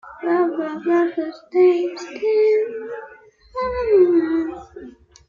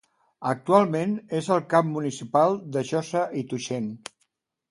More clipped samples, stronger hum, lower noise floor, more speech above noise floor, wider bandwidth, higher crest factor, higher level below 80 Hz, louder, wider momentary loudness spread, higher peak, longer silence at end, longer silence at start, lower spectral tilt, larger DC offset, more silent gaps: neither; neither; second, -46 dBFS vs -73 dBFS; second, 28 dB vs 49 dB; second, 7.2 kHz vs 11.5 kHz; second, 14 dB vs 22 dB; first, -50 dBFS vs -70 dBFS; first, -19 LUFS vs -25 LUFS; first, 17 LU vs 11 LU; about the same, -6 dBFS vs -4 dBFS; second, 0.4 s vs 0.75 s; second, 0.05 s vs 0.4 s; about the same, -6 dB/octave vs -6 dB/octave; neither; neither